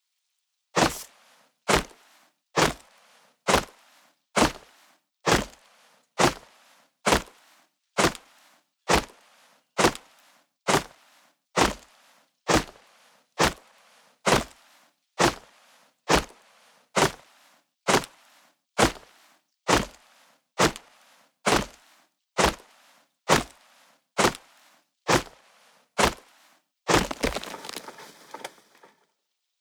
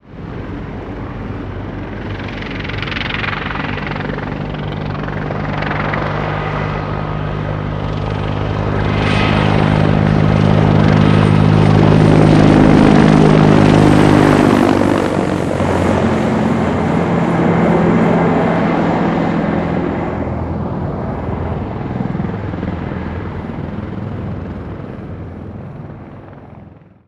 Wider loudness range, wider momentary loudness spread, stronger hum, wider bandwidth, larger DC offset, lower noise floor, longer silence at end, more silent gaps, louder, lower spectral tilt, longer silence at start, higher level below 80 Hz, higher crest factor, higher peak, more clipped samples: second, 2 LU vs 14 LU; first, 20 LU vs 17 LU; neither; first, over 20 kHz vs 10.5 kHz; neither; first, -79 dBFS vs -39 dBFS; first, 1.15 s vs 0.3 s; neither; second, -25 LUFS vs -14 LUFS; second, -3 dB/octave vs -7.5 dB/octave; first, 0.75 s vs 0.1 s; second, -46 dBFS vs -30 dBFS; first, 24 dB vs 14 dB; second, -6 dBFS vs 0 dBFS; neither